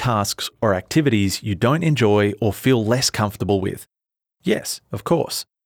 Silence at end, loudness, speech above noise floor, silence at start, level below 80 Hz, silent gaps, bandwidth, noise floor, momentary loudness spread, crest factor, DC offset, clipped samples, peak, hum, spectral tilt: 0.2 s; -20 LUFS; 62 dB; 0 s; -50 dBFS; none; 20 kHz; -82 dBFS; 9 LU; 16 dB; under 0.1%; under 0.1%; -4 dBFS; none; -5 dB/octave